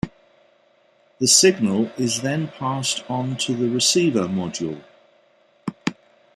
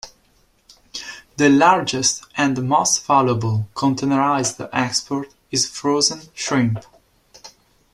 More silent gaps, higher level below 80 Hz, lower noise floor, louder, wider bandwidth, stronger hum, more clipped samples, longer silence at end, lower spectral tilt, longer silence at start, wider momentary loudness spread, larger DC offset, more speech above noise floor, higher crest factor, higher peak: neither; about the same, -58 dBFS vs -56 dBFS; about the same, -59 dBFS vs -59 dBFS; about the same, -20 LUFS vs -19 LUFS; about the same, 14 kHz vs 13 kHz; neither; neither; about the same, 0.45 s vs 0.45 s; about the same, -3.5 dB/octave vs -3.5 dB/octave; about the same, 0.05 s vs 0.05 s; about the same, 16 LU vs 14 LU; neither; about the same, 38 dB vs 41 dB; about the same, 22 dB vs 18 dB; about the same, 0 dBFS vs -2 dBFS